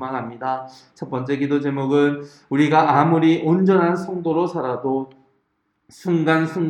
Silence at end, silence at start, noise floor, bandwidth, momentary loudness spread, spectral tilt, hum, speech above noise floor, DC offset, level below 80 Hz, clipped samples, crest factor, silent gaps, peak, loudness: 0 s; 0 s; -70 dBFS; 10 kHz; 13 LU; -8 dB/octave; none; 51 dB; under 0.1%; -68 dBFS; under 0.1%; 18 dB; none; -2 dBFS; -19 LUFS